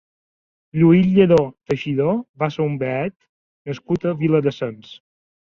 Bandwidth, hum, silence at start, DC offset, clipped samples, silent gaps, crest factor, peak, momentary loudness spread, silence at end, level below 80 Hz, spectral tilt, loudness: 7.2 kHz; none; 0.75 s; under 0.1%; under 0.1%; 2.29-2.34 s, 3.16-3.20 s, 3.29-3.65 s; 18 dB; -2 dBFS; 15 LU; 0.65 s; -54 dBFS; -9 dB/octave; -19 LUFS